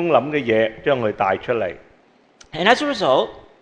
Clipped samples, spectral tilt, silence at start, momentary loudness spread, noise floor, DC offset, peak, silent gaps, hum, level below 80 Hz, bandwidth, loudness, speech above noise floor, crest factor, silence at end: under 0.1%; -5 dB/octave; 0 s; 8 LU; -54 dBFS; under 0.1%; 0 dBFS; none; none; -56 dBFS; 10 kHz; -19 LUFS; 36 dB; 20 dB; 0.2 s